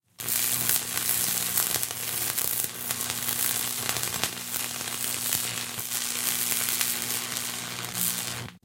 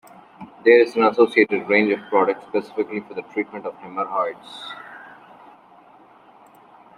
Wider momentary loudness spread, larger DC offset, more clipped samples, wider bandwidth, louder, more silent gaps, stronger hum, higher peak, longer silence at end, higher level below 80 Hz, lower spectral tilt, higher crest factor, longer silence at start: second, 6 LU vs 20 LU; neither; neither; first, 17.5 kHz vs 10.5 kHz; second, -26 LUFS vs -20 LUFS; neither; neither; about the same, 0 dBFS vs -2 dBFS; second, 0.05 s vs 1.95 s; first, -64 dBFS vs -72 dBFS; second, -0.5 dB/octave vs -6 dB/octave; first, 28 dB vs 20 dB; second, 0.2 s vs 0.4 s